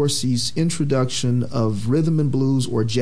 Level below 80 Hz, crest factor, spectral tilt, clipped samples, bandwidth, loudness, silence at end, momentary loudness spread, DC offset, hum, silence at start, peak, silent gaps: -50 dBFS; 12 dB; -6 dB/octave; under 0.1%; 11 kHz; -21 LUFS; 0 s; 2 LU; 3%; none; 0 s; -8 dBFS; none